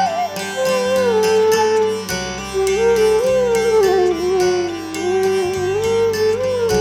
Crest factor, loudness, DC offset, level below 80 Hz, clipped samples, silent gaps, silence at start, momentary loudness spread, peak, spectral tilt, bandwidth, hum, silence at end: 14 dB; -17 LUFS; under 0.1%; -44 dBFS; under 0.1%; none; 0 s; 7 LU; -2 dBFS; -4 dB/octave; 16 kHz; none; 0 s